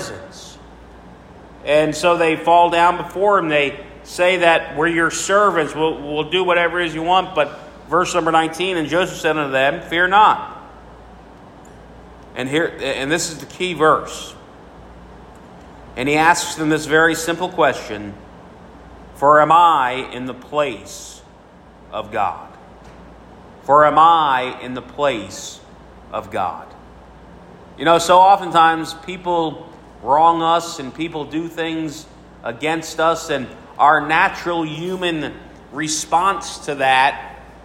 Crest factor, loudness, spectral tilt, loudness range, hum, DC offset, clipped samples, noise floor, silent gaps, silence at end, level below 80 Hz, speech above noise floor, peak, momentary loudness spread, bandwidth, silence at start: 18 dB; -17 LUFS; -3.5 dB/octave; 6 LU; none; under 0.1%; under 0.1%; -44 dBFS; none; 0.15 s; -48 dBFS; 27 dB; 0 dBFS; 19 LU; 16 kHz; 0 s